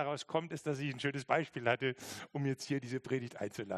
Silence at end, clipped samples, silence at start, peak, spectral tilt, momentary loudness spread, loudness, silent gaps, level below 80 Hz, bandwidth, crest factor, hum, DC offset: 0 s; under 0.1%; 0 s; -14 dBFS; -5.5 dB/octave; 8 LU; -37 LUFS; none; -78 dBFS; 13 kHz; 24 dB; none; under 0.1%